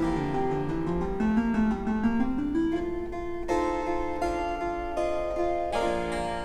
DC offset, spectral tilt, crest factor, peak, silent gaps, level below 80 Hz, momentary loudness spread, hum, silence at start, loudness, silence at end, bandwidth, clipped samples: under 0.1%; -7 dB/octave; 14 dB; -14 dBFS; none; -40 dBFS; 5 LU; none; 0 s; -29 LUFS; 0 s; 11.5 kHz; under 0.1%